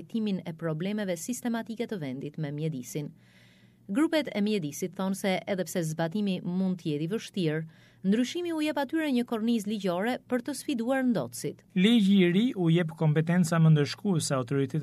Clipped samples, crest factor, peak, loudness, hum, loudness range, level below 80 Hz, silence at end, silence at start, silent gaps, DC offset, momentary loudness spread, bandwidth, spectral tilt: under 0.1%; 18 dB; -10 dBFS; -29 LUFS; none; 8 LU; -74 dBFS; 0 s; 0 s; none; under 0.1%; 11 LU; 15 kHz; -6 dB/octave